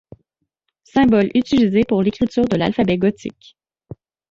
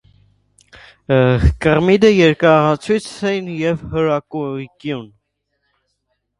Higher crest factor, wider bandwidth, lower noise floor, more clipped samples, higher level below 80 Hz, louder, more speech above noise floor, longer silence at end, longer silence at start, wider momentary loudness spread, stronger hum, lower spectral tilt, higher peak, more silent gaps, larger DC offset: about the same, 14 dB vs 16 dB; second, 7.6 kHz vs 11.5 kHz; first, -74 dBFS vs -70 dBFS; neither; second, -46 dBFS vs -30 dBFS; about the same, -17 LUFS vs -16 LUFS; about the same, 57 dB vs 55 dB; second, 1 s vs 1.35 s; second, 0.95 s vs 1.1 s; second, 7 LU vs 15 LU; second, none vs 50 Hz at -45 dBFS; about the same, -7.5 dB/octave vs -7 dB/octave; second, -4 dBFS vs 0 dBFS; neither; neither